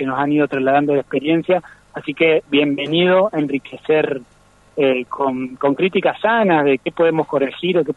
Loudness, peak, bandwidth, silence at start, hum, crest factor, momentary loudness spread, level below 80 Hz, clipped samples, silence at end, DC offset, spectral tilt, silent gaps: -17 LUFS; -2 dBFS; 7.8 kHz; 0 s; none; 14 dB; 8 LU; -58 dBFS; under 0.1%; 0.05 s; under 0.1%; -7.5 dB/octave; none